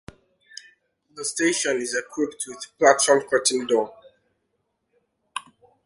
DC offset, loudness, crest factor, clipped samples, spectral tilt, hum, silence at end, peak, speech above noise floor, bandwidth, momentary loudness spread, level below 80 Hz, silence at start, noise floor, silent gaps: under 0.1%; -22 LUFS; 22 dB; under 0.1%; -1.5 dB/octave; none; 0.45 s; -2 dBFS; 53 dB; 11.5 kHz; 20 LU; -66 dBFS; 1.15 s; -75 dBFS; none